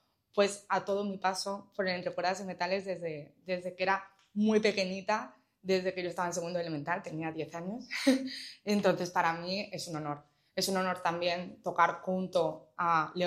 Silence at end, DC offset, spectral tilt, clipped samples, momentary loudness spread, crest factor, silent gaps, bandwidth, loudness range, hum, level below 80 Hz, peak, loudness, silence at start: 0 s; under 0.1%; -4.5 dB/octave; under 0.1%; 10 LU; 22 dB; none; 15.5 kHz; 2 LU; none; -78 dBFS; -12 dBFS; -33 LUFS; 0.35 s